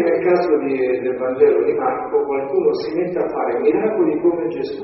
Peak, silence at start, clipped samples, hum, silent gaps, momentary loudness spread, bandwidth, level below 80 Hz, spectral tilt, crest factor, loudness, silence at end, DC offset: -4 dBFS; 0 s; under 0.1%; none; none; 6 LU; 5.8 kHz; -58 dBFS; -5.5 dB/octave; 14 dB; -18 LUFS; 0 s; under 0.1%